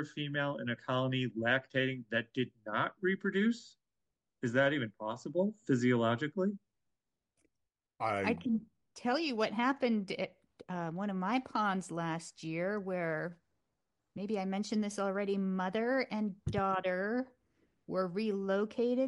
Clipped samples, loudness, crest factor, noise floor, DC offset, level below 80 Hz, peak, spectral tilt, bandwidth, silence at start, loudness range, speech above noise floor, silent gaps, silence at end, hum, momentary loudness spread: under 0.1%; -35 LUFS; 18 dB; -89 dBFS; under 0.1%; -68 dBFS; -16 dBFS; -6 dB/octave; 11.5 kHz; 0 s; 3 LU; 55 dB; none; 0 s; none; 8 LU